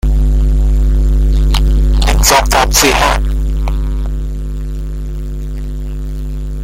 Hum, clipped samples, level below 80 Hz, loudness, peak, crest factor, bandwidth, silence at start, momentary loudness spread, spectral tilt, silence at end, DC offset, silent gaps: none; under 0.1%; -12 dBFS; -14 LUFS; 0 dBFS; 12 dB; 16 kHz; 0.05 s; 14 LU; -4 dB/octave; 0 s; under 0.1%; none